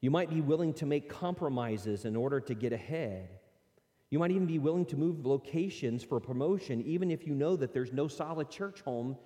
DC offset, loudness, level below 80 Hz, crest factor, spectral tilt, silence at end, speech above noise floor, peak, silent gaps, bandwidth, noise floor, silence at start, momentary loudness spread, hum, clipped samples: under 0.1%; -34 LUFS; -72 dBFS; 16 dB; -8 dB/octave; 0.05 s; 39 dB; -16 dBFS; none; 14.5 kHz; -72 dBFS; 0 s; 7 LU; none; under 0.1%